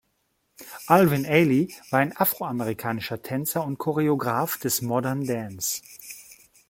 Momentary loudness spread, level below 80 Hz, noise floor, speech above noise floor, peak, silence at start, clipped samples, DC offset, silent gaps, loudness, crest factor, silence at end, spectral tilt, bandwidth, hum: 15 LU; -64 dBFS; -72 dBFS; 48 dB; -2 dBFS; 0.6 s; under 0.1%; under 0.1%; none; -24 LUFS; 22 dB; 0.35 s; -5 dB/octave; 16.5 kHz; none